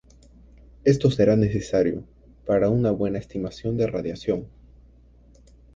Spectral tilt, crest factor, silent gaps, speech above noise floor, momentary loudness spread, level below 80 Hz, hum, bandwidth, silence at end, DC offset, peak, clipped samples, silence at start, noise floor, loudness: -8 dB/octave; 18 dB; none; 30 dB; 10 LU; -46 dBFS; none; 7.8 kHz; 1.3 s; under 0.1%; -6 dBFS; under 0.1%; 0.85 s; -52 dBFS; -23 LUFS